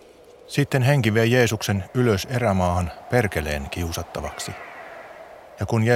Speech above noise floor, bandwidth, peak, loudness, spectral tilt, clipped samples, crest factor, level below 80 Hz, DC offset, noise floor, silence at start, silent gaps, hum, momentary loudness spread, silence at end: 26 dB; 16.5 kHz; -4 dBFS; -23 LUFS; -5.5 dB/octave; under 0.1%; 20 dB; -42 dBFS; under 0.1%; -47 dBFS; 0.5 s; none; none; 20 LU; 0 s